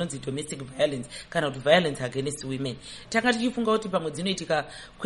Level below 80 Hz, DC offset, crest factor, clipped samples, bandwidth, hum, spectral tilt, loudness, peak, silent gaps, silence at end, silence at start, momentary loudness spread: -56 dBFS; under 0.1%; 22 dB; under 0.1%; 11.5 kHz; none; -4.5 dB/octave; -27 LUFS; -4 dBFS; none; 0 s; 0 s; 12 LU